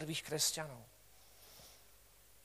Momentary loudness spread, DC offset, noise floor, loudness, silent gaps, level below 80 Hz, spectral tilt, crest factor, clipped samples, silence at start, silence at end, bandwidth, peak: 26 LU; under 0.1%; -65 dBFS; -37 LUFS; none; -72 dBFS; -2 dB/octave; 22 dB; under 0.1%; 0 s; 0.5 s; 15.5 kHz; -22 dBFS